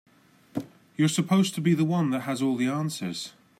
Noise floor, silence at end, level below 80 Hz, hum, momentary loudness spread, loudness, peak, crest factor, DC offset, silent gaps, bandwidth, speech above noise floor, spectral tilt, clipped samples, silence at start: -50 dBFS; 0.3 s; -72 dBFS; none; 14 LU; -26 LUFS; -12 dBFS; 14 dB; under 0.1%; none; 16 kHz; 25 dB; -5.5 dB/octave; under 0.1%; 0.55 s